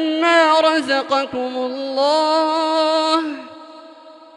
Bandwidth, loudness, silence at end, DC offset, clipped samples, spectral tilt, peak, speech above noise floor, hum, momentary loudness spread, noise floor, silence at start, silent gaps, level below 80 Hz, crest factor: 11 kHz; -17 LUFS; 0.2 s; under 0.1%; under 0.1%; -2 dB/octave; -2 dBFS; 24 dB; none; 10 LU; -42 dBFS; 0 s; none; -70 dBFS; 16 dB